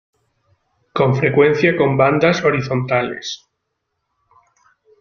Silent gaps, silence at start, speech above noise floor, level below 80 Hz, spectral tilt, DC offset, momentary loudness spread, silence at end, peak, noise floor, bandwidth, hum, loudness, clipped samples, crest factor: none; 0.95 s; 59 dB; -54 dBFS; -6.5 dB/octave; under 0.1%; 14 LU; 1.65 s; -2 dBFS; -74 dBFS; 7 kHz; none; -16 LUFS; under 0.1%; 18 dB